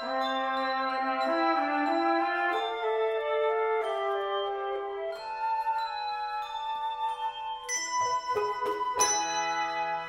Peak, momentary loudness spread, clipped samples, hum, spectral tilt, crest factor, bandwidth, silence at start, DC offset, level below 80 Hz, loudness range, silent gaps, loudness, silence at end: -10 dBFS; 7 LU; under 0.1%; none; -1 dB/octave; 18 dB; 16 kHz; 0 s; under 0.1%; -68 dBFS; 4 LU; none; -29 LUFS; 0 s